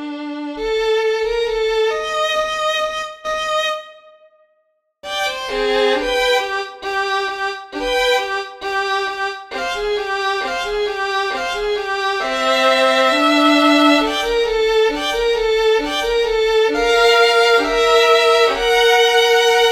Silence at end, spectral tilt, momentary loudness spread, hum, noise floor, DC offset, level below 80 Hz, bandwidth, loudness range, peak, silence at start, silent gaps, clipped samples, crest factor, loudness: 0 s; -1.5 dB/octave; 11 LU; none; -65 dBFS; under 0.1%; -42 dBFS; 16 kHz; 7 LU; -2 dBFS; 0 s; none; under 0.1%; 16 dB; -16 LUFS